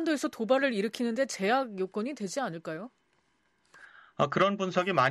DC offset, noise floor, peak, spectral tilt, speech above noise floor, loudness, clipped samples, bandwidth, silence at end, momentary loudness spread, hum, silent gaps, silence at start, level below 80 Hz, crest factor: under 0.1%; -72 dBFS; -12 dBFS; -5 dB/octave; 43 dB; -30 LUFS; under 0.1%; 13.5 kHz; 0 s; 13 LU; none; none; 0 s; -74 dBFS; 18 dB